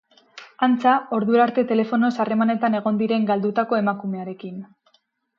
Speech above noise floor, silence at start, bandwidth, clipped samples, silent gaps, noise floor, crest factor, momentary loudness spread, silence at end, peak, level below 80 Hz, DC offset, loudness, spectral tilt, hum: 45 dB; 0.35 s; 6.8 kHz; under 0.1%; none; -65 dBFS; 16 dB; 12 LU; 0.75 s; -4 dBFS; -74 dBFS; under 0.1%; -21 LUFS; -8 dB/octave; none